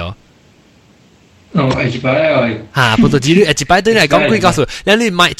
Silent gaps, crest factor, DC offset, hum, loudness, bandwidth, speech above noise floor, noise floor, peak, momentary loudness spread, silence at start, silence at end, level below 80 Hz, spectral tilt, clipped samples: none; 12 dB; under 0.1%; none; -12 LUFS; 16 kHz; 35 dB; -47 dBFS; 0 dBFS; 6 LU; 0 s; 0.05 s; -38 dBFS; -5 dB/octave; 0.2%